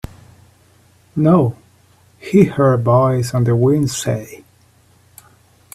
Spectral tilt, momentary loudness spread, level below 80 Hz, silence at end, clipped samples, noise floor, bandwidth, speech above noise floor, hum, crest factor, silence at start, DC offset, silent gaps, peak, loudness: -7 dB/octave; 14 LU; -48 dBFS; 1.4 s; under 0.1%; -52 dBFS; 14 kHz; 38 dB; none; 18 dB; 1.15 s; under 0.1%; none; 0 dBFS; -15 LUFS